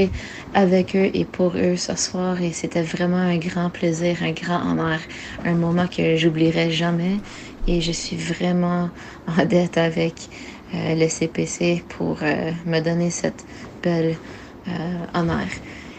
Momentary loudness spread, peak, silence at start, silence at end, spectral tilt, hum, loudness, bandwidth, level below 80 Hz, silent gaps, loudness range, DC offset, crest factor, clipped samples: 12 LU; -4 dBFS; 0 s; 0 s; -5.5 dB/octave; none; -22 LUFS; 9 kHz; -40 dBFS; none; 3 LU; under 0.1%; 18 dB; under 0.1%